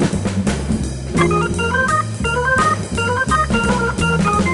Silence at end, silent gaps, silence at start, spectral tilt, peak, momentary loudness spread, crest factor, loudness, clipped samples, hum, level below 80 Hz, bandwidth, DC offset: 0 s; none; 0 s; -5 dB/octave; -4 dBFS; 4 LU; 14 dB; -17 LUFS; under 0.1%; none; -30 dBFS; 11.5 kHz; under 0.1%